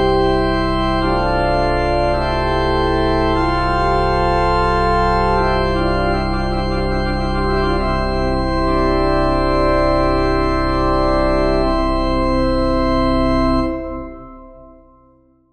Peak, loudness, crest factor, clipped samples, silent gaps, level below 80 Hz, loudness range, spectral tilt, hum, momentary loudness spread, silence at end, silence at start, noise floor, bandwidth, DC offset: -4 dBFS; -17 LUFS; 12 dB; under 0.1%; none; -22 dBFS; 2 LU; -7 dB/octave; none; 4 LU; 0.85 s; 0 s; -52 dBFS; 8.8 kHz; under 0.1%